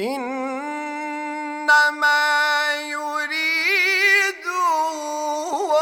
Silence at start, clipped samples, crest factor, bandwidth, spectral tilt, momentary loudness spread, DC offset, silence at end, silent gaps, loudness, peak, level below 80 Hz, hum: 0 s; under 0.1%; 16 dB; over 20 kHz; -0.5 dB/octave; 12 LU; under 0.1%; 0 s; none; -19 LUFS; -4 dBFS; -72 dBFS; none